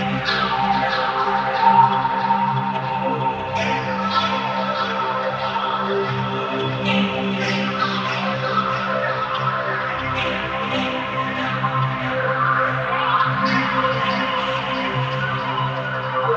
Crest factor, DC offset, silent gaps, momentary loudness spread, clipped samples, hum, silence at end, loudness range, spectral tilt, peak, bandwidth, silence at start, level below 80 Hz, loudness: 18 dB; under 0.1%; none; 4 LU; under 0.1%; none; 0 s; 3 LU; -6 dB/octave; -2 dBFS; 7.8 kHz; 0 s; -50 dBFS; -20 LUFS